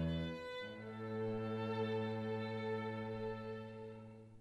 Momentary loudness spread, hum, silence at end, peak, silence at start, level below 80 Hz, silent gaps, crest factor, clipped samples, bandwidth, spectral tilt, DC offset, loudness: 11 LU; none; 0 s; -30 dBFS; 0 s; -62 dBFS; none; 12 dB; under 0.1%; 10.5 kHz; -8 dB/octave; under 0.1%; -43 LUFS